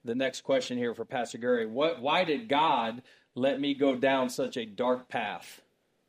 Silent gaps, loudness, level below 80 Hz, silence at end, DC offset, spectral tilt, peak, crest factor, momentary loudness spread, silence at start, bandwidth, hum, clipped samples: none; -29 LUFS; -78 dBFS; 0.5 s; under 0.1%; -4.5 dB/octave; -12 dBFS; 16 dB; 9 LU; 0.05 s; 15.5 kHz; none; under 0.1%